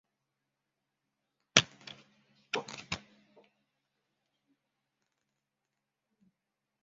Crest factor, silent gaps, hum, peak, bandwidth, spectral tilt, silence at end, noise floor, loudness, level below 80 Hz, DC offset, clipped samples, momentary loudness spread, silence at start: 40 dB; none; none; -2 dBFS; 7.4 kHz; -1 dB/octave; 3.85 s; -87 dBFS; -32 LUFS; -70 dBFS; under 0.1%; under 0.1%; 24 LU; 1.55 s